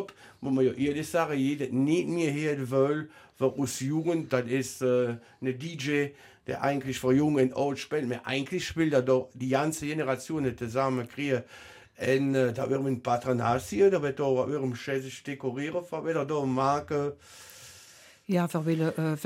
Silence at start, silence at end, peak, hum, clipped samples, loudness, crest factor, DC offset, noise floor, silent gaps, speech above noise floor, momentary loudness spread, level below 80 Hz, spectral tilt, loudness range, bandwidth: 0 s; 0 s; -12 dBFS; none; under 0.1%; -29 LUFS; 16 dB; under 0.1%; -54 dBFS; none; 26 dB; 9 LU; -62 dBFS; -6 dB/octave; 3 LU; 16 kHz